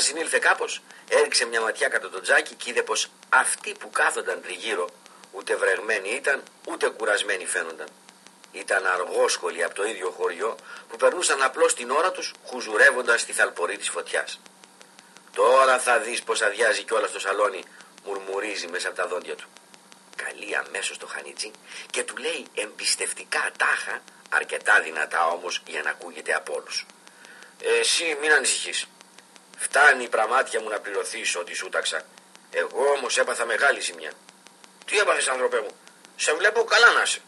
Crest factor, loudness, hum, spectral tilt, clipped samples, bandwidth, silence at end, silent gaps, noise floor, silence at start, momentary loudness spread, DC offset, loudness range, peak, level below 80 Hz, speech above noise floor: 22 dB; -23 LUFS; none; 1 dB/octave; under 0.1%; 12.5 kHz; 0.1 s; none; -51 dBFS; 0 s; 15 LU; under 0.1%; 6 LU; -4 dBFS; -90 dBFS; 27 dB